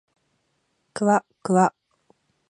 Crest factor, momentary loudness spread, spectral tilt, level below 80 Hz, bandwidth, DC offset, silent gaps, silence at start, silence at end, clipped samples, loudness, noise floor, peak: 22 dB; 5 LU; -6.5 dB/octave; -72 dBFS; 11 kHz; under 0.1%; none; 0.95 s; 0.85 s; under 0.1%; -22 LUFS; -72 dBFS; -4 dBFS